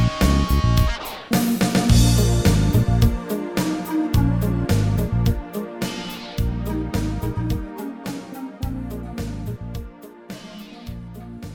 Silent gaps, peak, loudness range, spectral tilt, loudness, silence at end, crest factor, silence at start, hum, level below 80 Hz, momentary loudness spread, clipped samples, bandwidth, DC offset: none; -4 dBFS; 13 LU; -6 dB/octave; -22 LUFS; 0 s; 18 dB; 0 s; none; -28 dBFS; 18 LU; under 0.1%; 18.5 kHz; under 0.1%